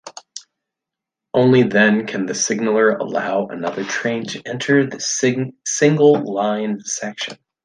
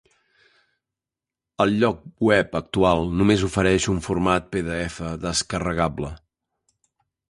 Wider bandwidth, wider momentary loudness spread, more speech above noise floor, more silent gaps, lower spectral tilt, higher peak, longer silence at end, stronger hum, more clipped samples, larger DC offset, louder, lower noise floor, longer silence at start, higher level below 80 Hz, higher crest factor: second, 10 kHz vs 11.5 kHz; first, 13 LU vs 8 LU; about the same, 67 dB vs 67 dB; neither; about the same, -4.5 dB/octave vs -5 dB/octave; about the same, -2 dBFS vs -4 dBFS; second, 0.3 s vs 1.15 s; neither; neither; neither; first, -18 LUFS vs -22 LUFS; second, -85 dBFS vs -89 dBFS; second, 0.05 s vs 1.6 s; second, -62 dBFS vs -42 dBFS; about the same, 16 dB vs 20 dB